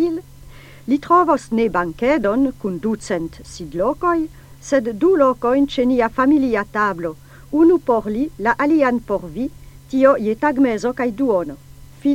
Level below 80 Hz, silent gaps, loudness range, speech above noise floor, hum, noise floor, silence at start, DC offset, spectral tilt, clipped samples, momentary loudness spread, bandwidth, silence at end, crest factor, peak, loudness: -44 dBFS; none; 3 LU; 23 dB; none; -40 dBFS; 0 s; under 0.1%; -6 dB/octave; under 0.1%; 13 LU; 16 kHz; 0 s; 16 dB; -2 dBFS; -18 LUFS